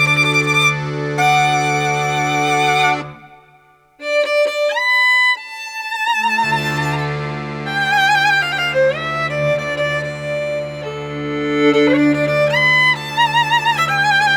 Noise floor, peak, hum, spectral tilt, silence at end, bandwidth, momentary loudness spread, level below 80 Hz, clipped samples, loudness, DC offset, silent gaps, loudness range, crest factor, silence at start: -50 dBFS; -4 dBFS; none; -4 dB/octave; 0 s; over 20 kHz; 11 LU; -50 dBFS; under 0.1%; -15 LUFS; under 0.1%; none; 3 LU; 14 dB; 0 s